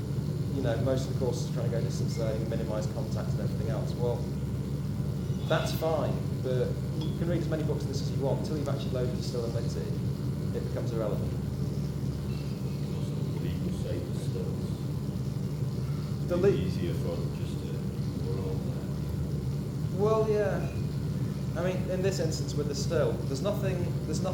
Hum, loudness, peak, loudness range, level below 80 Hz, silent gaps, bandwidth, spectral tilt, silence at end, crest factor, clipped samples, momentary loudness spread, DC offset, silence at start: none; -31 LUFS; -14 dBFS; 3 LU; -44 dBFS; none; 18 kHz; -7 dB/octave; 0 s; 16 dB; under 0.1%; 5 LU; under 0.1%; 0 s